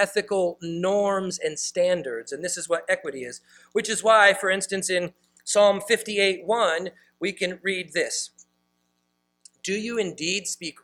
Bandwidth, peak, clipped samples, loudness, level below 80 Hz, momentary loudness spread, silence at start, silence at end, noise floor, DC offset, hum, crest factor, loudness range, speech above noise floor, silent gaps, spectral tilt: 16 kHz; -4 dBFS; under 0.1%; -24 LUFS; -70 dBFS; 13 LU; 0 s; 0.1 s; -73 dBFS; under 0.1%; 60 Hz at -55 dBFS; 22 dB; 8 LU; 49 dB; none; -2.5 dB/octave